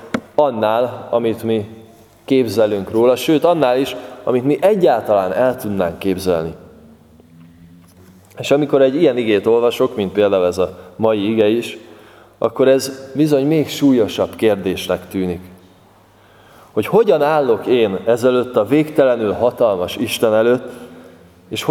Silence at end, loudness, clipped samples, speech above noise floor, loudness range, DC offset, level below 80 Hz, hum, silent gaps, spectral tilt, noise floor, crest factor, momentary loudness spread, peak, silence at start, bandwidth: 0 s; -16 LUFS; under 0.1%; 33 dB; 4 LU; under 0.1%; -54 dBFS; none; none; -6 dB/octave; -48 dBFS; 16 dB; 9 LU; 0 dBFS; 0 s; 17 kHz